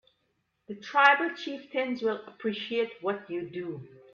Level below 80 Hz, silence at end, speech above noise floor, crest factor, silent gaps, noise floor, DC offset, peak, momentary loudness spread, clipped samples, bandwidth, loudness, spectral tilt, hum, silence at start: -78 dBFS; 0.15 s; 47 dB; 22 dB; none; -76 dBFS; under 0.1%; -8 dBFS; 18 LU; under 0.1%; 7.2 kHz; -28 LUFS; -5 dB/octave; none; 0.7 s